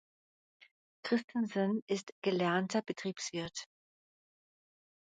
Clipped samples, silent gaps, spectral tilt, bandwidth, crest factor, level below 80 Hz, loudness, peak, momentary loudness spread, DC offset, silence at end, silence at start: under 0.1%; 1.24-1.28 s, 1.82-1.87 s, 2.03-2.22 s; -5 dB/octave; 9.4 kHz; 20 dB; -78 dBFS; -36 LUFS; -18 dBFS; 11 LU; under 0.1%; 1.4 s; 1.05 s